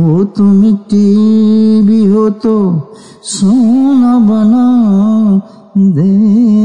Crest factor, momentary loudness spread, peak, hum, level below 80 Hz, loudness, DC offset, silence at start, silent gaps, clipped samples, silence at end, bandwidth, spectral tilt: 6 dB; 6 LU; -2 dBFS; none; -50 dBFS; -9 LUFS; under 0.1%; 0 s; none; under 0.1%; 0 s; 9.8 kHz; -8 dB/octave